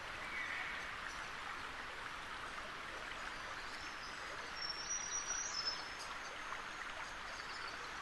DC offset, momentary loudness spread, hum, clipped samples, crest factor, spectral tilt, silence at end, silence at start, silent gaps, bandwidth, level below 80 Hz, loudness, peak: under 0.1%; 7 LU; none; under 0.1%; 16 dB; 0 dB/octave; 0 s; 0 s; none; 12 kHz; -64 dBFS; -44 LUFS; -28 dBFS